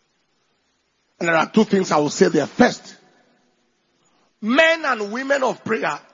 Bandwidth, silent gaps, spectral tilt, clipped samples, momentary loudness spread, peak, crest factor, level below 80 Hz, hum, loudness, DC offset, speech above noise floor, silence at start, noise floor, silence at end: 7.6 kHz; none; -4.5 dB/octave; under 0.1%; 8 LU; 0 dBFS; 20 dB; -62 dBFS; none; -19 LUFS; under 0.1%; 49 dB; 1.2 s; -67 dBFS; 0.15 s